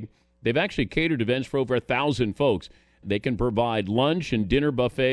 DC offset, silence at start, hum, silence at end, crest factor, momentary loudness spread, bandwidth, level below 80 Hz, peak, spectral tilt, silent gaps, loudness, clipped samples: under 0.1%; 0 s; none; 0 s; 18 dB; 5 LU; 11 kHz; -44 dBFS; -6 dBFS; -6.5 dB/octave; none; -25 LUFS; under 0.1%